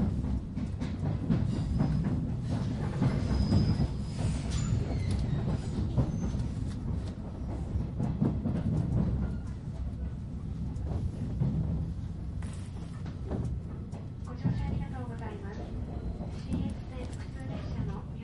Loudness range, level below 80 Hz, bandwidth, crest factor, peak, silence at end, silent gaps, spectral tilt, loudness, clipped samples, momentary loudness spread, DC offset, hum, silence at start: 6 LU; -38 dBFS; 11.5 kHz; 18 dB; -14 dBFS; 0 s; none; -8 dB/octave; -34 LUFS; under 0.1%; 9 LU; under 0.1%; none; 0 s